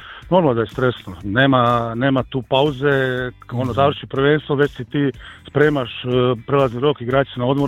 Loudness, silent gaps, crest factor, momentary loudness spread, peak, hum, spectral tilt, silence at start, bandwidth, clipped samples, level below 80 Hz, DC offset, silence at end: -18 LUFS; none; 18 dB; 7 LU; 0 dBFS; none; -8 dB/octave; 0 s; 10.5 kHz; under 0.1%; -44 dBFS; under 0.1%; 0 s